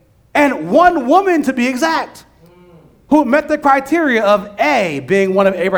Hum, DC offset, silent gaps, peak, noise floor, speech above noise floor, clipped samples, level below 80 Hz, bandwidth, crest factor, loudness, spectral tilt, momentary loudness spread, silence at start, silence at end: none; under 0.1%; none; 0 dBFS; -45 dBFS; 32 dB; under 0.1%; -50 dBFS; over 20 kHz; 14 dB; -14 LUFS; -5.5 dB/octave; 5 LU; 0.35 s; 0 s